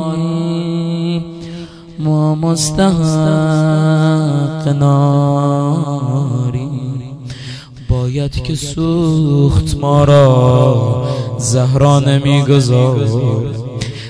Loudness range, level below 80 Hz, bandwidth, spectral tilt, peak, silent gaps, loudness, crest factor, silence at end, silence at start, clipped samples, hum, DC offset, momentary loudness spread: 6 LU; -34 dBFS; 11 kHz; -7 dB/octave; 0 dBFS; none; -13 LUFS; 12 dB; 0 s; 0 s; 0.3%; none; under 0.1%; 12 LU